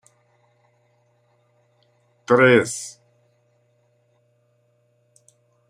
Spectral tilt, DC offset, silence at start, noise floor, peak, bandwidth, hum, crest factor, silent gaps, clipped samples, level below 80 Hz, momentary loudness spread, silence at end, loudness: -5 dB/octave; under 0.1%; 2.3 s; -64 dBFS; -2 dBFS; 15 kHz; 60 Hz at -50 dBFS; 24 dB; none; under 0.1%; -70 dBFS; 24 LU; 2.8 s; -17 LUFS